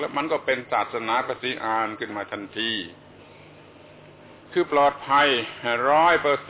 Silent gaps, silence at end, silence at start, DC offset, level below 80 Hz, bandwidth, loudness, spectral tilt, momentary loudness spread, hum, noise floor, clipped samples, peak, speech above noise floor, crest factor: none; 0 s; 0 s; under 0.1%; -62 dBFS; 4 kHz; -23 LUFS; -7.5 dB/octave; 11 LU; none; -48 dBFS; under 0.1%; -8 dBFS; 24 dB; 16 dB